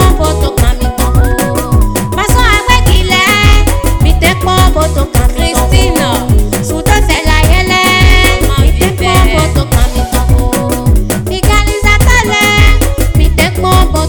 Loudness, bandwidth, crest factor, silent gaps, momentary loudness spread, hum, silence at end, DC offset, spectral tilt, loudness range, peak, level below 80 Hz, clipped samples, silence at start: -9 LUFS; 19.5 kHz; 8 dB; none; 5 LU; none; 0 s; 3%; -4.5 dB/octave; 2 LU; 0 dBFS; -10 dBFS; 3%; 0 s